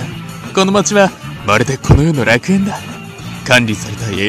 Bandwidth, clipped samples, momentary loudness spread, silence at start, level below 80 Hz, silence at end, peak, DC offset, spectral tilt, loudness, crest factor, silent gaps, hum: 14.5 kHz; 0.2%; 14 LU; 0 s; -28 dBFS; 0 s; 0 dBFS; under 0.1%; -5 dB/octave; -13 LUFS; 14 dB; none; none